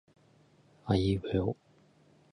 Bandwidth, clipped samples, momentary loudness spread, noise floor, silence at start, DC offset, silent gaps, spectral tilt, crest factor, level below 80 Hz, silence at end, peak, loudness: 10.5 kHz; under 0.1%; 17 LU; -64 dBFS; 0.85 s; under 0.1%; none; -8 dB/octave; 20 dB; -50 dBFS; 0.8 s; -14 dBFS; -31 LUFS